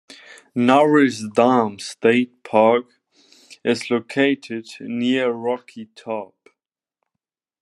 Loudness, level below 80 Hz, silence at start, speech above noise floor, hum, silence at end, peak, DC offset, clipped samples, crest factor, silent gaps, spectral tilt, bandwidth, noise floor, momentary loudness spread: -19 LUFS; -72 dBFS; 0.1 s; 65 dB; none; 1.35 s; 0 dBFS; under 0.1%; under 0.1%; 20 dB; none; -5.5 dB/octave; 11.5 kHz; -84 dBFS; 14 LU